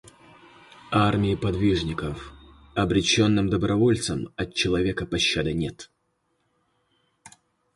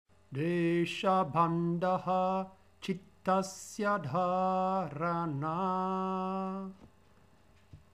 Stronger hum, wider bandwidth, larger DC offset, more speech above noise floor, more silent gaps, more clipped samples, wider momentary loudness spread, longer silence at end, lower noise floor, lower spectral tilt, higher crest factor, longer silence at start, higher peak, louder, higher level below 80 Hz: neither; second, 11.5 kHz vs 14 kHz; neither; first, 49 dB vs 32 dB; neither; neither; about the same, 12 LU vs 10 LU; first, 0.45 s vs 0.15 s; first, -73 dBFS vs -64 dBFS; second, -5 dB/octave vs -6.5 dB/octave; about the same, 18 dB vs 18 dB; first, 0.85 s vs 0.3 s; first, -8 dBFS vs -16 dBFS; first, -24 LUFS vs -32 LUFS; first, -44 dBFS vs -72 dBFS